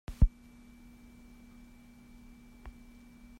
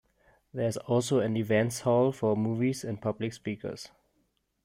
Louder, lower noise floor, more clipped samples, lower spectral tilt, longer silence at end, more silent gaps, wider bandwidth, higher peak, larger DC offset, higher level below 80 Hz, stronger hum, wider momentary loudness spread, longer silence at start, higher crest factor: second, -32 LUFS vs -29 LUFS; second, -55 dBFS vs -74 dBFS; neither; first, -8 dB/octave vs -6 dB/octave; about the same, 0.7 s vs 0.8 s; neither; second, 10 kHz vs 16 kHz; about the same, -12 dBFS vs -12 dBFS; neither; first, -38 dBFS vs -66 dBFS; neither; first, 25 LU vs 13 LU; second, 0.1 s vs 0.55 s; first, 24 dB vs 18 dB